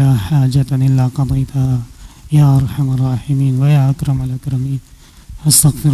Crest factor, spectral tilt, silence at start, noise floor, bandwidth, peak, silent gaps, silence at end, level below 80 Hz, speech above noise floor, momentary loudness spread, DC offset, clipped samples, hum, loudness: 12 dB; -5.5 dB/octave; 0 s; -35 dBFS; 15 kHz; 0 dBFS; none; 0 s; -34 dBFS; 22 dB; 10 LU; under 0.1%; under 0.1%; none; -14 LUFS